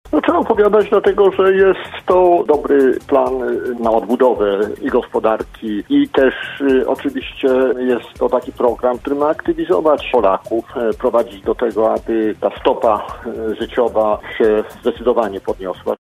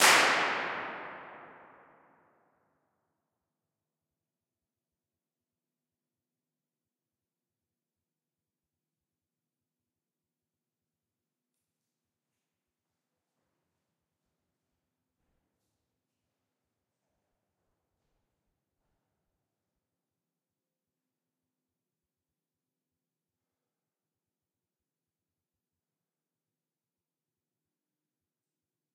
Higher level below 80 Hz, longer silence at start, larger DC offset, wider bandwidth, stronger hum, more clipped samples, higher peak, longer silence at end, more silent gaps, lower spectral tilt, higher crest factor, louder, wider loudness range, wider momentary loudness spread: first, -42 dBFS vs -86 dBFS; about the same, 0.05 s vs 0 s; neither; first, 14 kHz vs 7.4 kHz; neither; neither; first, 0 dBFS vs -6 dBFS; second, 0.05 s vs 27.5 s; neither; first, -6.5 dB/octave vs 1.5 dB/octave; second, 16 dB vs 36 dB; first, -16 LUFS vs -27 LUFS; second, 4 LU vs 24 LU; second, 9 LU vs 25 LU